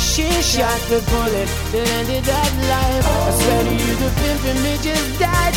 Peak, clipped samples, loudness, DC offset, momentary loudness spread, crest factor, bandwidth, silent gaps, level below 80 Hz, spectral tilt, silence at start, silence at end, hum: -2 dBFS; under 0.1%; -18 LUFS; under 0.1%; 3 LU; 14 dB; over 20 kHz; none; -24 dBFS; -4 dB/octave; 0 s; 0 s; none